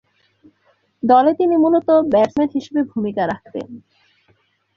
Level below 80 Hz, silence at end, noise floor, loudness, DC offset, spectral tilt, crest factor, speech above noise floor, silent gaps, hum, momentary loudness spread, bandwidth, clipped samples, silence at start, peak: -58 dBFS; 0.95 s; -61 dBFS; -17 LUFS; under 0.1%; -7.5 dB/octave; 16 dB; 45 dB; none; none; 15 LU; 7.2 kHz; under 0.1%; 1.05 s; -2 dBFS